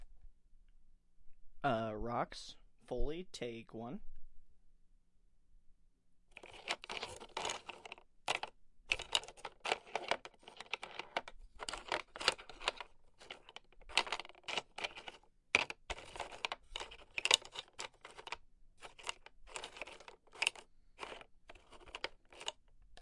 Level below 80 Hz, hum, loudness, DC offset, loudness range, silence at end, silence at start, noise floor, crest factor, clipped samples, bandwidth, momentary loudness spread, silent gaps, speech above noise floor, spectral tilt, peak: -56 dBFS; none; -41 LUFS; under 0.1%; 11 LU; 0 s; 0 s; -67 dBFS; 36 dB; under 0.1%; 11.5 kHz; 19 LU; none; 27 dB; -1.5 dB/octave; -8 dBFS